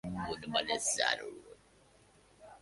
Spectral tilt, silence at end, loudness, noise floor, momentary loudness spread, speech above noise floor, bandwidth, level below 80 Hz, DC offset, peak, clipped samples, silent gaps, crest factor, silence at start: -1.5 dB/octave; 0.05 s; -33 LUFS; -64 dBFS; 15 LU; 29 dB; 12 kHz; -62 dBFS; under 0.1%; -14 dBFS; under 0.1%; none; 24 dB; 0.05 s